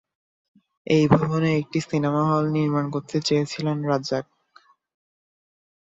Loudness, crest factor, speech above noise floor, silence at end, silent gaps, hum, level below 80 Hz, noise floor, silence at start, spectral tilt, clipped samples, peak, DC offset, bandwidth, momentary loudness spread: -23 LUFS; 22 dB; 35 dB; 1.75 s; none; none; -58 dBFS; -57 dBFS; 0.85 s; -6.5 dB/octave; under 0.1%; -2 dBFS; under 0.1%; 7.8 kHz; 7 LU